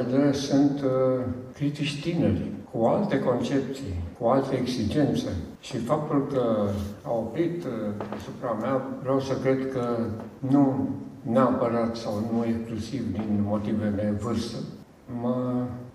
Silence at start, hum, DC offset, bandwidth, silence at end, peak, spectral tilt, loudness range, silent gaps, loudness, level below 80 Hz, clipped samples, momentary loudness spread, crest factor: 0 s; none; under 0.1%; 13 kHz; 0.05 s; -8 dBFS; -7 dB/octave; 3 LU; none; -27 LUFS; -54 dBFS; under 0.1%; 10 LU; 18 dB